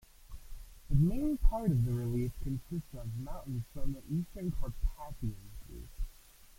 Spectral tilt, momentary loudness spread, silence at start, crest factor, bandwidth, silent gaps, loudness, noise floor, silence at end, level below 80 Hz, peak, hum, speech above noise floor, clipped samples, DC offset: -8.5 dB/octave; 20 LU; 0.2 s; 20 dB; 16.5 kHz; none; -36 LUFS; -56 dBFS; 0.45 s; -38 dBFS; -14 dBFS; none; 24 dB; under 0.1%; under 0.1%